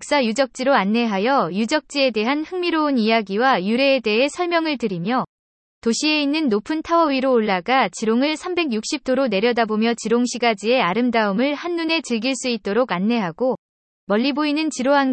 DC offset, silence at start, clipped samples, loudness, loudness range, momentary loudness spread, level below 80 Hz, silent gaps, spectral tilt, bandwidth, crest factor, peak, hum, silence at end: under 0.1%; 0 s; under 0.1%; -20 LUFS; 2 LU; 5 LU; -62 dBFS; 5.29-5.81 s, 13.58-14.07 s; -4 dB/octave; 8.8 kHz; 16 dB; -4 dBFS; none; 0 s